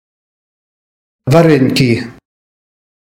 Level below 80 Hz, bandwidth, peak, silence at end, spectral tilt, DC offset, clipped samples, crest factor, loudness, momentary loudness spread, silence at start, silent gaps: -48 dBFS; 16.5 kHz; 0 dBFS; 1 s; -6.5 dB/octave; under 0.1%; under 0.1%; 16 dB; -11 LUFS; 16 LU; 1.25 s; none